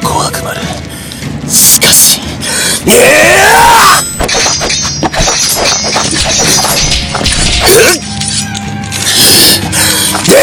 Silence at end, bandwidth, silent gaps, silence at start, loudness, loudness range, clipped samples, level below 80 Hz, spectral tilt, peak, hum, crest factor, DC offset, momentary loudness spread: 0 s; over 20 kHz; none; 0 s; -5 LUFS; 4 LU; 7%; -24 dBFS; -1.5 dB/octave; 0 dBFS; none; 8 dB; under 0.1%; 14 LU